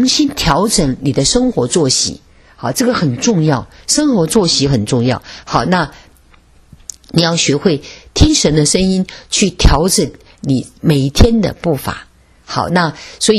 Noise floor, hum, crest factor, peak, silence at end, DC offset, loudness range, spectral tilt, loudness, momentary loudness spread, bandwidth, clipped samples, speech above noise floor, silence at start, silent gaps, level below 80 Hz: -46 dBFS; none; 14 dB; 0 dBFS; 0 s; under 0.1%; 3 LU; -4.5 dB/octave; -14 LUFS; 11 LU; 13.5 kHz; 0.1%; 33 dB; 0 s; none; -24 dBFS